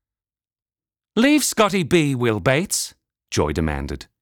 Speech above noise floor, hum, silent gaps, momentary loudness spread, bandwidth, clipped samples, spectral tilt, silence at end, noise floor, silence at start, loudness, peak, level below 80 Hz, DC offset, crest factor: over 71 dB; none; none; 11 LU; over 20 kHz; under 0.1%; -4.5 dB/octave; 0.2 s; under -90 dBFS; 1.15 s; -20 LUFS; -6 dBFS; -40 dBFS; under 0.1%; 16 dB